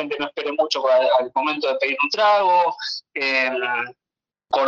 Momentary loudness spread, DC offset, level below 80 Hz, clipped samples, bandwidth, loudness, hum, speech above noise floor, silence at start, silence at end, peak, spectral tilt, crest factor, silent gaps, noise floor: 9 LU; under 0.1%; -74 dBFS; under 0.1%; 7.4 kHz; -20 LUFS; none; 69 dB; 0 s; 0 s; -6 dBFS; -2.5 dB/octave; 16 dB; none; -89 dBFS